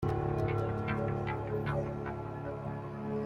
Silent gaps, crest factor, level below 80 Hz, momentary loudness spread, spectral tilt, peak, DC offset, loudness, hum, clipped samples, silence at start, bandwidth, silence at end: none; 16 dB; -50 dBFS; 7 LU; -9 dB/octave; -20 dBFS; under 0.1%; -35 LUFS; none; under 0.1%; 0 s; 6.8 kHz; 0 s